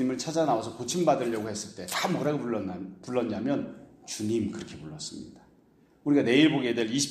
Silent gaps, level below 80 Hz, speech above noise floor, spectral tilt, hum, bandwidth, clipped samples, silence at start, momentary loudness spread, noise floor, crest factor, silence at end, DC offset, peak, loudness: none; -66 dBFS; 33 dB; -4.5 dB/octave; none; 15.5 kHz; under 0.1%; 0 s; 17 LU; -61 dBFS; 20 dB; 0 s; under 0.1%; -8 dBFS; -28 LUFS